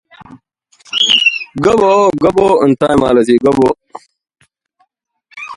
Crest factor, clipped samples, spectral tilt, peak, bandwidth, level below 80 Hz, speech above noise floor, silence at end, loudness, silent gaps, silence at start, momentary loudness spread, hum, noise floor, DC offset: 14 dB; under 0.1%; -4.5 dB/octave; 0 dBFS; 11.5 kHz; -44 dBFS; 51 dB; 0 s; -11 LUFS; none; 0.3 s; 6 LU; none; -61 dBFS; under 0.1%